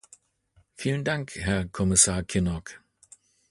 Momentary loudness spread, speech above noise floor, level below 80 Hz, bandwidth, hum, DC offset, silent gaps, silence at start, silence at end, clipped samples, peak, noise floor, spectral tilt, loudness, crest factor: 13 LU; 39 dB; -44 dBFS; 11.5 kHz; none; under 0.1%; none; 0.8 s; 0.75 s; under 0.1%; -6 dBFS; -65 dBFS; -3.5 dB/octave; -25 LUFS; 24 dB